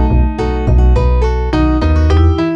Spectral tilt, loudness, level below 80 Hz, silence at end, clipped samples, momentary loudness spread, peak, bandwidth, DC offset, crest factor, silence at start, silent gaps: -8.5 dB/octave; -13 LUFS; -12 dBFS; 0 s; under 0.1%; 4 LU; -2 dBFS; 6.8 kHz; under 0.1%; 10 dB; 0 s; none